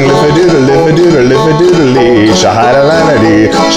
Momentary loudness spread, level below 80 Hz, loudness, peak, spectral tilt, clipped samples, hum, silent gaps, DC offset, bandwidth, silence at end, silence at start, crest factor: 1 LU; -32 dBFS; -6 LUFS; 0 dBFS; -5.5 dB/octave; 0.3%; none; none; 0.9%; 12.5 kHz; 0 s; 0 s; 6 dB